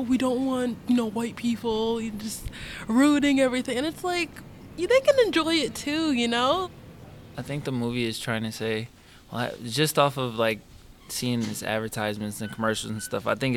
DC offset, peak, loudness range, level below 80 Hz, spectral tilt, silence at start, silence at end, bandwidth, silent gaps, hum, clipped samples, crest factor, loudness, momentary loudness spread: under 0.1%; -6 dBFS; 5 LU; -52 dBFS; -4.5 dB/octave; 0 s; 0 s; 17.5 kHz; none; none; under 0.1%; 20 dB; -26 LUFS; 14 LU